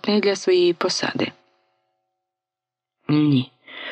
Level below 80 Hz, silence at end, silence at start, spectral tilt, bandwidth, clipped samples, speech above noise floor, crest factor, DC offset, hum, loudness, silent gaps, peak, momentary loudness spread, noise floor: -72 dBFS; 0 s; 0.05 s; -5.5 dB/octave; 9 kHz; under 0.1%; 68 dB; 18 dB; under 0.1%; none; -20 LUFS; none; -6 dBFS; 15 LU; -87 dBFS